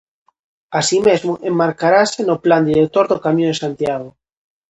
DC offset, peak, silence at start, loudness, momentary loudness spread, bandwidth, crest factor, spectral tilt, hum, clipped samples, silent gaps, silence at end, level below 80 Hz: under 0.1%; 0 dBFS; 0.7 s; -16 LUFS; 8 LU; 9 kHz; 16 dB; -5 dB/octave; none; under 0.1%; none; 0.6 s; -56 dBFS